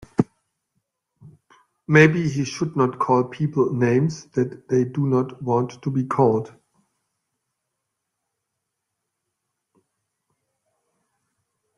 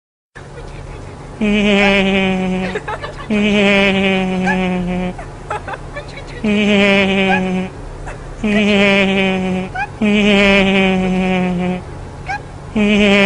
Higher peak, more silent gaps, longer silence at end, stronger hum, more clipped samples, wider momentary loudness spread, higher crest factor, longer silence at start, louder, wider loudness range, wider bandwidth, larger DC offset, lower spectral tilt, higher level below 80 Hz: about the same, -2 dBFS vs 0 dBFS; neither; first, 5.3 s vs 0 s; neither; neither; second, 10 LU vs 19 LU; first, 22 dB vs 16 dB; second, 0.2 s vs 0.35 s; second, -21 LUFS vs -14 LUFS; first, 7 LU vs 3 LU; about the same, 11 kHz vs 10.5 kHz; neither; about the same, -7 dB/octave vs -6 dB/octave; second, -62 dBFS vs -34 dBFS